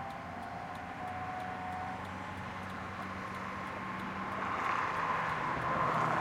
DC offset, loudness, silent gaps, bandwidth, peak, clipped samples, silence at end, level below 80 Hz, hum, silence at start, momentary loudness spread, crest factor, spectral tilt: under 0.1%; -37 LUFS; none; 16 kHz; -18 dBFS; under 0.1%; 0 s; -62 dBFS; none; 0 s; 10 LU; 18 dB; -5.5 dB/octave